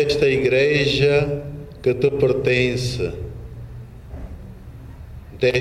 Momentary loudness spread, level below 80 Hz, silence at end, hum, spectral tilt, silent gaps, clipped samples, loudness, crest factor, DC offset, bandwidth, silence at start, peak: 22 LU; -40 dBFS; 0 s; none; -6 dB/octave; none; under 0.1%; -19 LUFS; 14 dB; under 0.1%; 12.5 kHz; 0 s; -6 dBFS